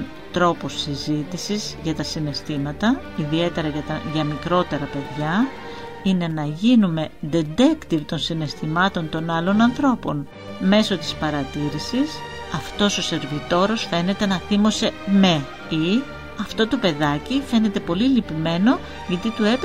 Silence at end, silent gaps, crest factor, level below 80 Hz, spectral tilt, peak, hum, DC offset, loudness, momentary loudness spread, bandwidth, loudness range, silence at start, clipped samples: 0 s; none; 18 dB; -46 dBFS; -5.5 dB/octave; -2 dBFS; none; 0.8%; -22 LUFS; 9 LU; 13 kHz; 3 LU; 0 s; under 0.1%